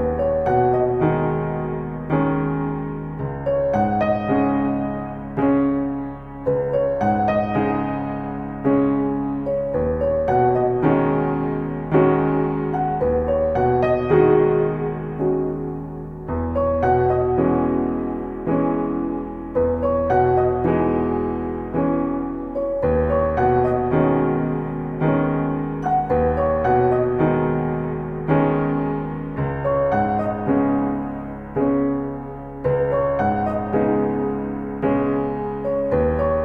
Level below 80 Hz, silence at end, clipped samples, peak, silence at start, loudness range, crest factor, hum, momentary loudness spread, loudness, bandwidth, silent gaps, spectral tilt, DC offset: -38 dBFS; 0 s; under 0.1%; -4 dBFS; 0 s; 2 LU; 16 dB; none; 8 LU; -21 LUFS; 4.8 kHz; none; -10.5 dB/octave; under 0.1%